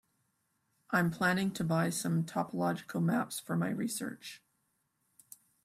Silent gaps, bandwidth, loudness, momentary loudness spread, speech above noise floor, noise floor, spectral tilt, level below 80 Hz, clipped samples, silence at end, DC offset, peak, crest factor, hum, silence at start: none; 16 kHz; -33 LUFS; 9 LU; 46 dB; -79 dBFS; -5.5 dB/octave; -72 dBFS; under 0.1%; 1.3 s; under 0.1%; -16 dBFS; 18 dB; none; 0.9 s